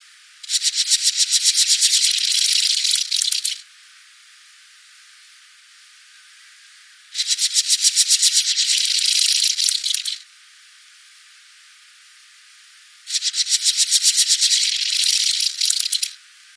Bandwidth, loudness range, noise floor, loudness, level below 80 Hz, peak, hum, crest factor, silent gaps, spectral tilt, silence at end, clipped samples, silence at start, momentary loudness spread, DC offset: 11 kHz; 12 LU; -49 dBFS; -16 LUFS; under -90 dBFS; 0 dBFS; none; 22 dB; none; 12 dB/octave; 0.4 s; under 0.1%; 0.45 s; 9 LU; under 0.1%